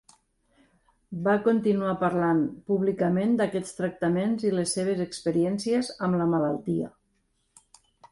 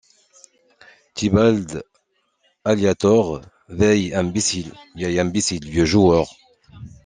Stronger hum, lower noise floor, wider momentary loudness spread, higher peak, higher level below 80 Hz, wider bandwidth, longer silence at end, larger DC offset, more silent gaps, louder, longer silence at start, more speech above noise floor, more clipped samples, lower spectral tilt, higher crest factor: neither; first, -72 dBFS vs -66 dBFS; second, 6 LU vs 16 LU; second, -12 dBFS vs -2 dBFS; second, -62 dBFS vs -46 dBFS; first, 11.5 kHz vs 10 kHz; about the same, 0.05 s vs 0.15 s; neither; neither; second, -26 LUFS vs -19 LUFS; about the same, 1.1 s vs 1.15 s; about the same, 46 dB vs 48 dB; neither; about the same, -6 dB/octave vs -5 dB/octave; about the same, 16 dB vs 18 dB